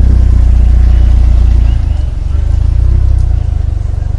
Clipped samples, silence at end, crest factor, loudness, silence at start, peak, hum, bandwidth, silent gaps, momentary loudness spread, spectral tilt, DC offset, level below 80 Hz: under 0.1%; 0 s; 8 dB; -11 LUFS; 0 s; 0 dBFS; none; 3.7 kHz; none; 6 LU; -8.5 dB/octave; under 0.1%; -8 dBFS